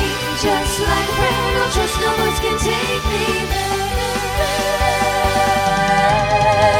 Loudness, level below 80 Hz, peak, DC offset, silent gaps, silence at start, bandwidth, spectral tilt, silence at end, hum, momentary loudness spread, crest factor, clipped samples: -17 LUFS; -28 dBFS; -2 dBFS; under 0.1%; none; 0 s; 17 kHz; -3.5 dB/octave; 0 s; none; 5 LU; 14 dB; under 0.1%